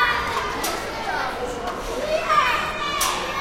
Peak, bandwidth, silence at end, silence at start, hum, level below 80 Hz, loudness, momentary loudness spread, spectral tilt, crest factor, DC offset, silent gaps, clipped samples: -6 dBFS; 16.5 kHz; 0 s; 0 s; none; -42 dBFS; -23 LUFS; 9 LU; -2 dB/octave; 18 dB; under 0.1%; none; under 0.1%